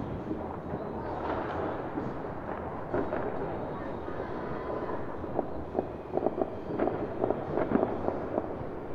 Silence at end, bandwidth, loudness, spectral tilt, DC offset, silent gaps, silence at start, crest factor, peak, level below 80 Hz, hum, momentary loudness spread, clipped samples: 0 s; 7 kHz; -34 LUFS; -9.5 dB/octave; under 0.1%; none; 0 s; 24 dB; -10 dBFS; -50 dBFS; none; 6 LU; under 0.1%